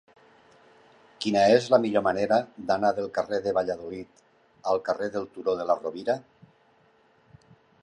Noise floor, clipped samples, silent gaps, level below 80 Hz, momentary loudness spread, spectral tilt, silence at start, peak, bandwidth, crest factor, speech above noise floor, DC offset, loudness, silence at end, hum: -62 dBFS; under 0.1%; none; -66 dBFS; 12 LU; -5.5 dB/octave; 1.2 s; -6 dBFS; 11 kHz; 20 dB; 37 dB; under 0.1%; -26 LUFS; 1.6 s; none